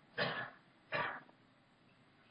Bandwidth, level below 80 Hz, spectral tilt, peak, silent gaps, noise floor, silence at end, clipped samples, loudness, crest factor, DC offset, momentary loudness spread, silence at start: 8.2 kHz; -80 dBFS; -6.5 dB/octave; -24 dBFS; none; -69 dBFS; 1.05 s; under 0.1%; -42 LUFS; 22 dB; under 0.1%; 12 LU; 0.15 s